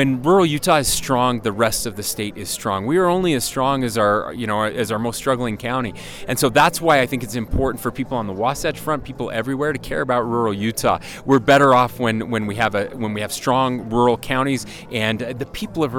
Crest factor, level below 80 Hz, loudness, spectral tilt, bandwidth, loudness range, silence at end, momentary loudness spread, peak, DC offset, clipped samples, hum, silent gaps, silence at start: 16 dB; -40 dBFS; -20 LUFS; -4.5 dB/octave; 18.5 kHz; 4 LU; 0 s; 10 LU; -4 dBFS; under 0.1%; under 0.1%; none; none; 0 s